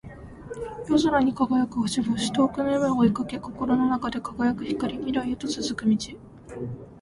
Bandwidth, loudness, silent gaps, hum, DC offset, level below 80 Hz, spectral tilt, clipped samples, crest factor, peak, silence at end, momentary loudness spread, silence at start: 11.5 kHz; -25 LUFS; none; none; under 0.1%; -50 dBFS; -5.5 dB/octave; under 0.1%; 16 dB; -8 dBFS; 0 s; 15 LU; 0.05 s